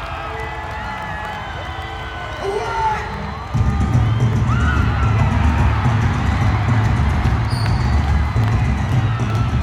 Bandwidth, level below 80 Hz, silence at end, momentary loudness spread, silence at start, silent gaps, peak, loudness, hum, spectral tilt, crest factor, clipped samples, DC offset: 10 kHz; -24 dBFS; 0 s; 10 LU; 0 s; none; -4 dBFS; -19 LUFS; none; -7 dB/octave; 14 dB; under 0.1%; under 0.1%